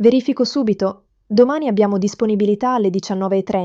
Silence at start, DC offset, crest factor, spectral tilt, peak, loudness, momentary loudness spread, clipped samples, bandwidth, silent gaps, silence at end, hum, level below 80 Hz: 0 s; under 0.1%; 14 dB; -6.5 dB/octave; -2 dBFS; -18 LUFS; 5 LU; under 0.1%; 7.6 kHz; none; 0 s; none; -58 dBFS